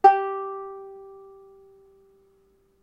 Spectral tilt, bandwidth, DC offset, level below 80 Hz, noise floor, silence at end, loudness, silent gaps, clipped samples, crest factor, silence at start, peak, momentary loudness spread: -4.5 dB/octave; 6.8 kHz; under 0.1%; -70 dBFS; -63 dBFS; 1.7 s; -26 LUFS; none; under 0.1%; 24 dB; 0.05 s; -4 dBFS; 25 LU